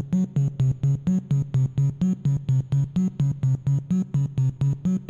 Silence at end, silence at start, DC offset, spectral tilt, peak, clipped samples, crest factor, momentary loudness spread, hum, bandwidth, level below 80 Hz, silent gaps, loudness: 0 s; 0 s; under 0.1%; -9.5 dB/octave; -14 dBFS; under 0.1%; 8 dB; 2 LU; none; 7.2 kHz; -48 dBFS; none; -24 LUFS